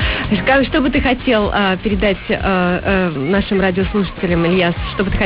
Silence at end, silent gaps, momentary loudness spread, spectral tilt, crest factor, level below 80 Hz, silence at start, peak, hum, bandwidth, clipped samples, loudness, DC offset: 0 s; none; 4 LU; -11 dB/octave; 12 dB; -28 dBFS; 0 s; -4 dBFS; none; 5.4 kHz; under 0.1%; -16 LUFS; 0.2%